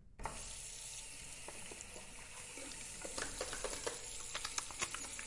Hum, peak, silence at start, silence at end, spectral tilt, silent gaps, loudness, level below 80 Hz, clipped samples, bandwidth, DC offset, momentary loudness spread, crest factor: none; -22 dBFS; 0 s; 0 s; -1 dB/octave; none; -44 LUFS; -58 dBFS; under 0.1%; 11.5 kHz; under 0.1%; 8 LU; 24 dB